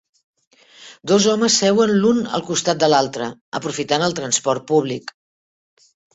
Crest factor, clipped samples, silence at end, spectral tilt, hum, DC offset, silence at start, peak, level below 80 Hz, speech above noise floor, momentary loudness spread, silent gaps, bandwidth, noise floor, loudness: 18 dB; under 0.1%; 1.05 s; -3.5 dB/octave; none; under 0.1%; 0.8 s; -2 dBFS; -60 dBFS; 27 dB; 12 LU; 3.41-3.52 s; 8.4 kHz; -45 dBFS; -18 LUFS